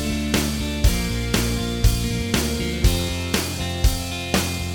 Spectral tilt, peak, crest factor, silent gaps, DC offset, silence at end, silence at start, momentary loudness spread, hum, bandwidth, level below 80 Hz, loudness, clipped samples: -4.5 dB/octave; -2 dBFS; 18 dB; none; under 0.1%; 0 s; 0 s; 3 LU; none; 20 kHz; -26 dBFS; -22 LUFS; under 0.1%